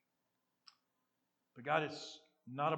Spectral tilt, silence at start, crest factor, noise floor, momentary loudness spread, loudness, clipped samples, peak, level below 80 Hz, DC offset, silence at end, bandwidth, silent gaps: -5 dB/octave; 1.55 s; 26 dB; -85 dBFS; 15 LU; -40 LUFS; under 0.1%; -18 dBFS; under -90 dBFS; under 0.1%; 0 s; 18.5 kHz; none